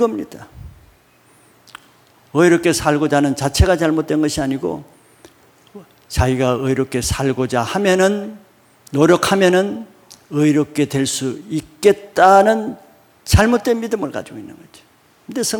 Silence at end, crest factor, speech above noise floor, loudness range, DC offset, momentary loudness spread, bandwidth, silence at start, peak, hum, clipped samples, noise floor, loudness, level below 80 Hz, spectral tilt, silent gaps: 0 s; 18 dB; 36 dB; 4 LU; under 0.1%; 16 LU; 19 kHz; 0 s; 0 dBFS; none; under 0.1%; -52 dBFS; -16 LUFS; -34 dBFS; -5 dB/octave; none